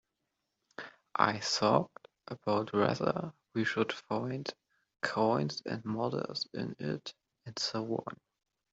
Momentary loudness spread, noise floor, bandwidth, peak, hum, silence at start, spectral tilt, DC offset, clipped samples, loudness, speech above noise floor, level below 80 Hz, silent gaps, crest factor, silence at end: 18 LU; -84 dBFS; 8 kHz; -8 dBFS; none; 0.8 s; -5 dB/octave; under 0.1%; under 0.1%; -33 LUFS; 51 dB; -74 dBFS; none; 26 dB; 0.6 s